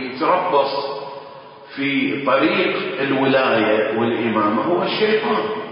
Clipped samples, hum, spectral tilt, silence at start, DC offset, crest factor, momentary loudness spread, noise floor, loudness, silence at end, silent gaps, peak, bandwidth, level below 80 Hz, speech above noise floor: under 0.1%; none; -10 dB/octave; 0 s; under 0.1%; 14 dB; 11 LU; -39 dBFS; -18 LUFS; 0 s; none; -4 dBFS; 5.4 kHz; -64 dBFS; 21 dB